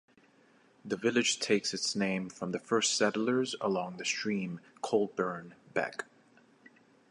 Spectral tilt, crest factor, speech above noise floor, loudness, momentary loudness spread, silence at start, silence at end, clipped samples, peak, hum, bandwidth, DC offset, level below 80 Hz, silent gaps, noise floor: -3 dB/octave; 20 dB; 32 dB; -32 LUFS; 12 LU; 0.85 s; 1.05 s; under 0.1%; -14 dBFS; none; 11.5 kHz; under 0.1%; -76 dBFS; none; -64 dBFS